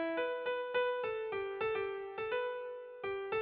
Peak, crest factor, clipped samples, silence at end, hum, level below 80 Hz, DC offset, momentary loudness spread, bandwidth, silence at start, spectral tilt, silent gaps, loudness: -24 dBFS; 14 dB; under 0.1%; 0 s; none; -72 dBFS; under 0.1%; 7 LU; 4.8 kHz; 0 s; -1.5 dB/octave; none; -38 LUFS